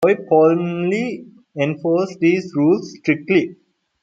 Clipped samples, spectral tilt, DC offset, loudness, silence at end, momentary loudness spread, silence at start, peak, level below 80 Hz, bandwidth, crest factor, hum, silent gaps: under 0.1%; -7.5 dB/octave; under 0.1%; -18 LUFS; 0.5 s; 11 LU; 0 s; -2 dBFS; -66 dBFS; 7.6 kHz; 16 dB; none; none